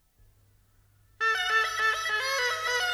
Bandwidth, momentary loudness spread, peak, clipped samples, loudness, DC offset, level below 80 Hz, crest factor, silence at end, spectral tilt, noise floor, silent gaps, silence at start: over 20 kHz; 3 LU; -14 dBFS; under 0.1%; -26 LUFS; under 0.1%; -64 dBFS; 16 dB; 0 s; 1.5 dB/octave; -63 dBFS; none; 1.2 s